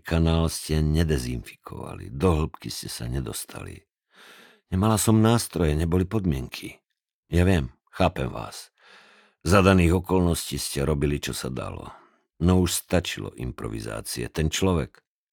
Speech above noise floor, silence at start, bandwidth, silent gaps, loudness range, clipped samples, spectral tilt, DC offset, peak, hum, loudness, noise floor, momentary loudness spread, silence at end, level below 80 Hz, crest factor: 31 dB; 0.05 s; 18.5 kHz; 7.13-7.23 s; 5 LU; under 0.1%; -5.5 dB/octave; under 0.1%; -4 dBFS; none; -25 LUFS; -55 dBFS; 17 LU; 0.45 s; -36 dBFS; 20 dB